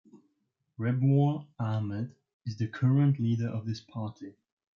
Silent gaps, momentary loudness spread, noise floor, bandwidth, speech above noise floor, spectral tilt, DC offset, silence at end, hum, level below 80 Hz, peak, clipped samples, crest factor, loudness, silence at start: 2.34-2.40 s; 16 LU; -78 dBFS; 6.6 kHz; 50 dB; -9 dB/octave; under 0.1%; 0.45 s; none; -74 dBFS; -14 dBFS; under 0.1%; 16 dB; -30 LUFS; 0.15 s